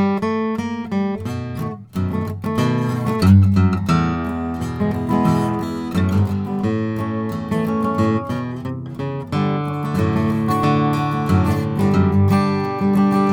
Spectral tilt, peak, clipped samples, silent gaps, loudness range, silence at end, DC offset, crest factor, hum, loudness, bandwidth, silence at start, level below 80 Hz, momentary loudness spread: -8 dB/octave; -2 dBFS; under 0.1%; none; 4 LU; 0 s; under 0.1%; 16 dB; none; -19 LUFS; 16 kHz; 0 s; -42 dBFS; 9 LU